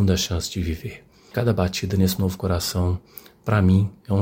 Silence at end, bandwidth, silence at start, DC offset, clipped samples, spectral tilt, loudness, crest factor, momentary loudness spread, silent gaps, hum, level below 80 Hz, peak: 0 s; 16.5 kHz; 0 s; under 0.1%; under 0.1%; -6 dB/octave; -23 LUFS; 18 dB; 12 LU; none; none; -40 dBFS; -4 dBFS